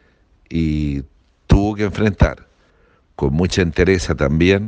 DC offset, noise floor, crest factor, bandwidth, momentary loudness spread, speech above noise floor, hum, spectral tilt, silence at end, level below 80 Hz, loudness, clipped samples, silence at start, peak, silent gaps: under 0.1%; -55 dBFS; 18 dB; 9.4 kHz; 8 LU; 39 dB; none; -6.5 dB/octave; 0 s; -26 dBFS; -18 LUFS; under 0.1%; 0.5 s; 0 dBFS; none